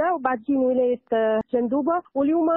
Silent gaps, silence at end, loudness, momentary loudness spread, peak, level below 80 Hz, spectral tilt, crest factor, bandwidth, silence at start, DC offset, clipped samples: none; 0 s; -23 LUFS; 2 LU; -8 dBFS; -64 dBFS; -10 dB/octave; 14 dB; 3.8 kHz; 0 s; under 0.1%; under 0.1%